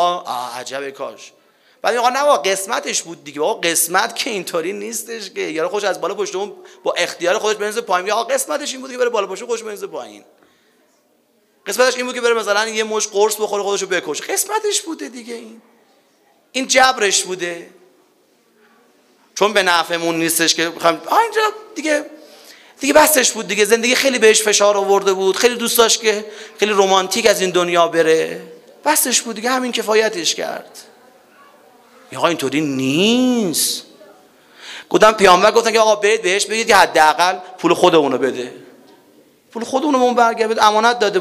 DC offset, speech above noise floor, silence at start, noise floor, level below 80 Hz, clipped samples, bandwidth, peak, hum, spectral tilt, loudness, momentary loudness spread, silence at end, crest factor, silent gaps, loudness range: under 0.1%; 43 dB; 0 s; -59 dBFS; -60 dBFS; under 0.1%; 16 kHz; 0 dBFS; none; -2 dB/octave; -16 LUFS; 14 LU; 0 s; 18 dB; none; 7 LU